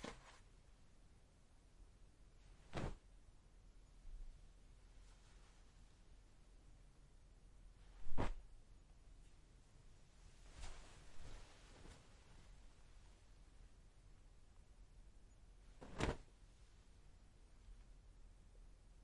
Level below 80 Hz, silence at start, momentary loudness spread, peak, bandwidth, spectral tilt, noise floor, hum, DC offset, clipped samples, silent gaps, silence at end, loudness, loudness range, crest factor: -58 dBFS; 0 s; 19 LU; -24 dBFS; 11 kHz; -5.5 dB/octave; -68 dBFS; none; under 0.1%; under 0.1%; none; 0 s; -56 LUFS; 14 LU; 26 dB